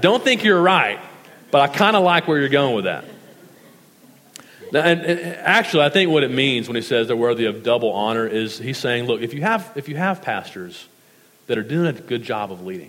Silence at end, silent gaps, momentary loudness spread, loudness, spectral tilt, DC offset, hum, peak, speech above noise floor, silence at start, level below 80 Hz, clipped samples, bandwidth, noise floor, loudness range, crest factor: 0 s; none; 11 LU; -19 LUFS; -5 dB/octave; under 0.1%; none; 0 dBFS; 34 dB; 0 s; -72 dBFS; under 0.1%; 16.5 kHz; -53 dBFS; 6 LU; 20 dB